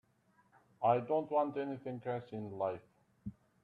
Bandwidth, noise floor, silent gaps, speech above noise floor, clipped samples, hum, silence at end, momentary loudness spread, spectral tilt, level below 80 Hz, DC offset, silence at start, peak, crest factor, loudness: 4.7 kHz; -72 dBFS; none; 36 dB; under 0.1%; none; 0.3 s; 18 LU; -9.5 dB/octave; -72 dBFS; under 0.1%; 0.8 s; -16 dBFS; 22 dB; -37 LUFS